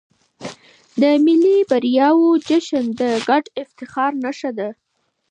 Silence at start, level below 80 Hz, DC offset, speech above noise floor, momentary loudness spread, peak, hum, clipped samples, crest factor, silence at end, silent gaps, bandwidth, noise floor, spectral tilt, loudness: 0.4 s; -68 dBFS; under 0.1%; 25 dB; 17 LU; -4 dBFS; none; under 0.1%; 14 dB; 0.55 s; none; 9.4 kHz; -42 dBFS; -5 dB/octave; -17 LUFS